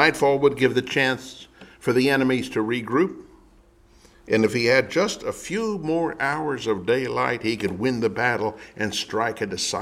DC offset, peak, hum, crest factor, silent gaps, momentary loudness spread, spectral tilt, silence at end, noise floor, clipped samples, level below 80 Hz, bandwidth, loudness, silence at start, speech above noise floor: under 0.1%; -2 dBFS; none; 22 dB; none; 8 LU; -4.5 dB/octave; 0 s; -54 dBFS; under 0.1%; -56 dBFS; 15.5 kHz; -23 LUFS; 0 s; 31 dB